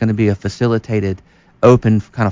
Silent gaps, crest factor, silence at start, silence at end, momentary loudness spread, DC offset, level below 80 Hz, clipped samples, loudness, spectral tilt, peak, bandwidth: none; 14 dB; 0 s; 0 s; 9 LU; under 0.1%; -38 dBFS; under 0.1%; -15 LUFS; -8 dB/octave; 0 dBFS; 7.6 kHz